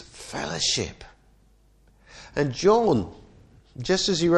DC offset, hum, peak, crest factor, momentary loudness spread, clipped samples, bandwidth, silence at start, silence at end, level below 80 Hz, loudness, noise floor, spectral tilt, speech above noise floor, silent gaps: under 0.1%; none; -6 dBFS; 18 dB; 15 LU; under 0.1%; 11.5 kHz; 0 s; 0 s; -50 dBFS; -24 LUFS; -58 dBFS; -4 dB/octave; 36 dB; none